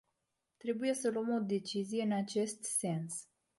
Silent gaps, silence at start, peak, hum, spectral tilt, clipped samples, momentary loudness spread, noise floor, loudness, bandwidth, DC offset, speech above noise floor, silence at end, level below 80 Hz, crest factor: none; 0.65 s; -22 dBFS; none; -4.5 dB/octave; under 0.1%; 7 LU; -85 dBFS; -36 LUFS; 12 kHz; under 0.1%; 50 dB; 0.35 s; -82 dBFS; 16 dB